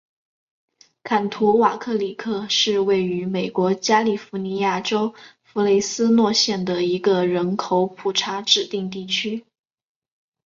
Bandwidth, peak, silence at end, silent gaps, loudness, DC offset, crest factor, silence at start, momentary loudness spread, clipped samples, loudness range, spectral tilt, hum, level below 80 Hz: 7.6 kHz; -2 dBFS; 1.05 s; none; -20 LUFS; under 0.1%; 20 dB; 1.05 s; 9 LU; under 0.1%; 2 LU; -4 dB/octave; none; -64 dBFS